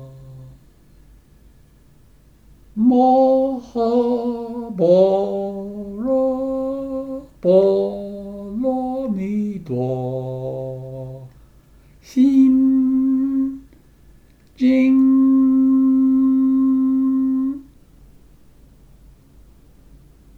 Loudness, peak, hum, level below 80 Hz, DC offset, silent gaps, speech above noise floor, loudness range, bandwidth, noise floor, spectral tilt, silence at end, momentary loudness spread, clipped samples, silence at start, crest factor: -18 LUFS; -2 dBFS; none; -50 dBFS; under 0.1%; none; 35 dB; 9 LU; 6 kHz; -50 dBFS; -9 dB/octave; 2.75 s; 16 LU; under 0.1%; 0 s; 16 dB